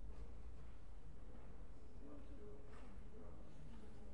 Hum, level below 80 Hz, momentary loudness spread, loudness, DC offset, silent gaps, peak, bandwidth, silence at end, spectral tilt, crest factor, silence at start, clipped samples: none; -58 dBFS; 3 LU; -60 LUFS; 0.4%; none; -40 dBFS; 10.5 kHz; 0 s; -7 dB/octave; 12 dB; 0 s; under 0.1%